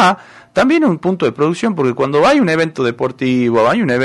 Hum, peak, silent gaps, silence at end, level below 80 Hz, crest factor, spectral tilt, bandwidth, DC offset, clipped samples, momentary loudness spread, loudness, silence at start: none; -2 dBFS; none; 0 s; -50 dBFS; 12 dB; -6 dB/octave; 11.5 kHz; under 0.1%; under 0.1%; 6 LU; -14 LUFS; 0 s